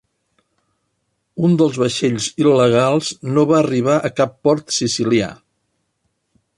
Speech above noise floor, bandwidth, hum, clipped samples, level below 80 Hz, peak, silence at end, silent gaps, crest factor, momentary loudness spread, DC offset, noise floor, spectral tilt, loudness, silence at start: 54 dB; 11.5 kHz; none; under 0.1%; -56 dBFS; -2 dBFS; 1.25 s; none; 16 dB; 6 LU; under 0.1%; -70 dBFS; -5.5 dB/octave; -16 LUFS; 1.35 s